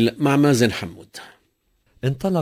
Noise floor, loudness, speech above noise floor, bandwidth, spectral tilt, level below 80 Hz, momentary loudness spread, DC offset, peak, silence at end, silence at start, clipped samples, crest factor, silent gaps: -66 dBFS; -20 LUFS; 46 dB; 16 kHz; -6 dB/octave; -52 dBFS; 23 LU; under 0.1%; -2 dBFS; 0 s; 0 s; under 0.1%; 18 dB; none